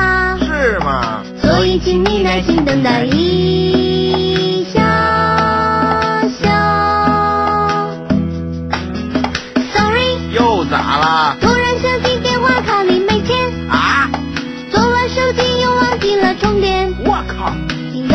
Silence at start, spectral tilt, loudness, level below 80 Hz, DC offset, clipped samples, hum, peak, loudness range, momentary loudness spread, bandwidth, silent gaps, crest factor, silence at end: 0 s; -5.5 dB/octave; -14 LUFS; -30 dBFS; under 0.1%; under 0.1%; none; 0 dBFS; 2 LU; 6 LU; 8.8 kHz; none; 14 dB; 0 s